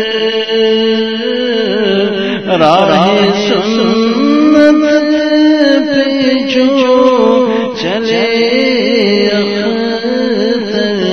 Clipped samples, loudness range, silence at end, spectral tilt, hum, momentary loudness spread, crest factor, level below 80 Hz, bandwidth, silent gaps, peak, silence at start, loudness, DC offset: 0.2%; 3 LU; 0 s; -5.5 dB/octave; none; 6 LU; 10 dB; -50 dBFS; 6.6 kHz; none; 0 dBFS; 0 s; -10 LUFS; 0.6%